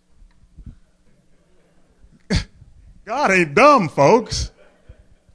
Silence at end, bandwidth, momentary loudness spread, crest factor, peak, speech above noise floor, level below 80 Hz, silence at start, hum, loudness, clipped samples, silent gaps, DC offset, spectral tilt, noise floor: 0.4 s; 11 kHz; 16 LU; 18 dB; -2 dBFS; 39 dB; -38 dBFS; 0.6 s; none; -16 LUFS; under 0.1%; none; under 0.1%; -5 dB/octave; -54 dBFS